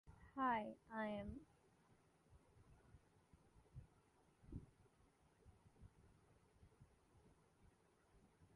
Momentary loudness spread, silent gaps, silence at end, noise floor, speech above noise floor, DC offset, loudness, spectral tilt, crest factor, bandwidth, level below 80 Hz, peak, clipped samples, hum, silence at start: 26 LU; none; 0.1 s; -76 dBFS; 30 dB; under 0.1%; -47 LUFS; -7 dB/octave; 24 dB; 11 kHz; -72 dBFS; -32 dBFS; under 0.1%; none; 0.05 s